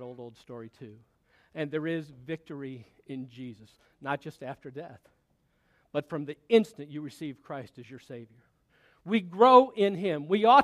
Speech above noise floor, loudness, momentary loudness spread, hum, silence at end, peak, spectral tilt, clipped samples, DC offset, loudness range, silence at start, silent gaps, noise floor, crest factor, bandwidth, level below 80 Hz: 43 dB; -27 LUFS; 25 LU; none; 0 s; -4 dBFS; -6.5 dB/octave; under 0.1%; under 0.1%; 14 LU; 0 s; none; -72 dBFS; 24 dB; 12 kHz; -74 dBFS